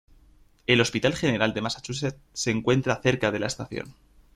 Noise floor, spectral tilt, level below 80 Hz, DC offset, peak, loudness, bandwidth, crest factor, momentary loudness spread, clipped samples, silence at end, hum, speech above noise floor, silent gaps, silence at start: -57 dBFS; -4.5 dB/octave; -54 dBFS; under 0.1%; -4 dBFS; -25 LUFS; 13.5 kHz; 22 dB; 12 LU; under 0.1%; 0.45 s; none; 31 dB; none; 0.7 s